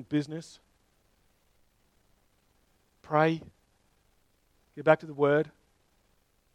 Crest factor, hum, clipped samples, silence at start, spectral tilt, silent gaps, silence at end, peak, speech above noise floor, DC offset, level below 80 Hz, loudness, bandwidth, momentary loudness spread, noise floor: 26 dB; none; under 0.1%; 0 s; -7 dB/octave; none; 1.05 s; -6 dBFS; 42 dB; under 0.1%; -70 dBFS; -28 LUFS; 10.5 kHz; 16 LU; -69 dBFS